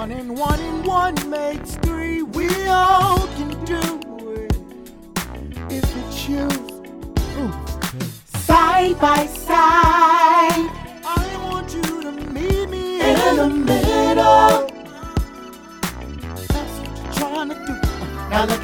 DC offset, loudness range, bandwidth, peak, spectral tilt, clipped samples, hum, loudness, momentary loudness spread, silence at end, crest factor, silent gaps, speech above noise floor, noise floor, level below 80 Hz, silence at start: under 0.1%; 11 LU; over 20 kHz; -2 dBFS; -5 dB/octave; under 0.1%; none; -19 LUFS; 17 LU; 0 s; 18 dB; none; 20 dB; -39 dBFS; -30 dBFS; 0 s